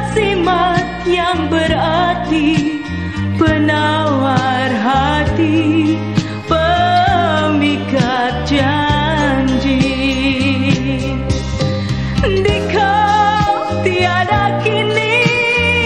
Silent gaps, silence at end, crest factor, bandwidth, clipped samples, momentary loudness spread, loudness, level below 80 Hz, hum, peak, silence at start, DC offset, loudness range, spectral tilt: none; 0 s; 14 dB; 10 kHz; under 0.1%; 6 LU; -14 LUFS; -30 dBFS; none; 0 dBFS; 0 s; 0.4%; 2 LU; -6 dB/octave